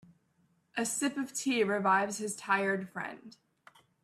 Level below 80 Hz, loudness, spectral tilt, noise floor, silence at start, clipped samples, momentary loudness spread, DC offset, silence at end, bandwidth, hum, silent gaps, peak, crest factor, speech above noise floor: -80 dBFS; -32 LUFS; -3.5 dB/octave; -72 dBFS; 0.75 s; under 0.1%; 13 LU; under 0.1%; 0.75 s; 15.5 kHz; none; none; -14 dBFS; 20 dB; 40 dB